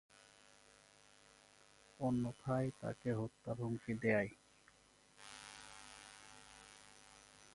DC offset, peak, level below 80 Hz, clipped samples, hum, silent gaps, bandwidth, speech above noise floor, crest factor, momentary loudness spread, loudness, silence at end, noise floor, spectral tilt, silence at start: under 0.1%; -22 dBFS; -72 dBFS; under 0.1%; none; none; 11.5 kHz; 29 dB; 22 dB; 26 LU; -41 LUFS; 0.3 s; -69 dBFS; -6.5 dB/octave; 2 s